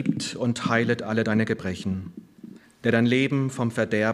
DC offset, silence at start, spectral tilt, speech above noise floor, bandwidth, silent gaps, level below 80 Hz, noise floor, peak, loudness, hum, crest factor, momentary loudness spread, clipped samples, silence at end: under 0.1%; 0 s; -6 dB/octave; 22 dB; 12 kHz; none; -62 dBFS; -46 dBFS; -6 dBFS; -25 LUFS; none; 20 dB; 10 LU; under 0.1%; 0 s